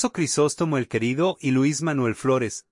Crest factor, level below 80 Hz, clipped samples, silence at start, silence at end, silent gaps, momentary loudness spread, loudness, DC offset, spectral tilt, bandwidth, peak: 14 dB; -62 dBFS; under 0.1%; 0 s; 0.1 s; none; 3 LU; -23 LUFS; under 0.1%; -5 dB/octave; 11.5 kHz; -10 dBFS